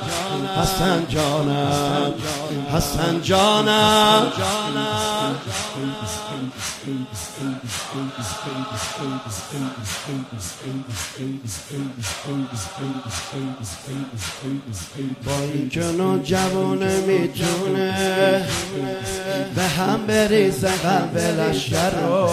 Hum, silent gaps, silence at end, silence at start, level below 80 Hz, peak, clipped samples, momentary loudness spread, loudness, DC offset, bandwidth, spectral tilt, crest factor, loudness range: none; none; 0 s; 0 s; -44 dBFS; -2 dBFS; under 0.1%; 12 LU; -22 LUFS; under 0.1%; 16 kHz; -4.5 dB/octave; 20 dB; 10 LU